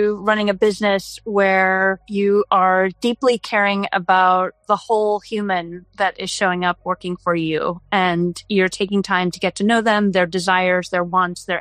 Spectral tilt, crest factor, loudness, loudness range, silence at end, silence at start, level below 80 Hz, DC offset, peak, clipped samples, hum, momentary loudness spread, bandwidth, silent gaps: -5 dB/octave; 16 dB; -18 LUFS; 4 LU; 0 s; 0 s; -56 dBFS; under 0.1%; -2 dBFS; under 0.1%; none; 7 LU; 14 kHz; none